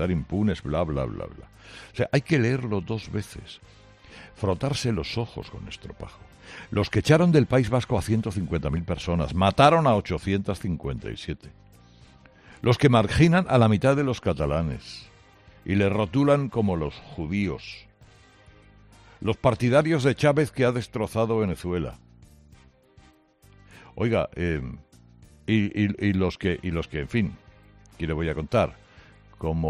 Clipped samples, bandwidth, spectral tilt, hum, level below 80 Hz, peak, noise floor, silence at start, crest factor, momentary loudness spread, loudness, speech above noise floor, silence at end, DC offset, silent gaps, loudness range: under 0.1%; 13.5 kHz; -7 dB/octave; none; -46 dBFS; -4 dBFS; -56 dBFS; 0 s; 20 dB; 19 LU; -24 LUFS; 32 dB; 0 s; under 0.1%; none; 8 LU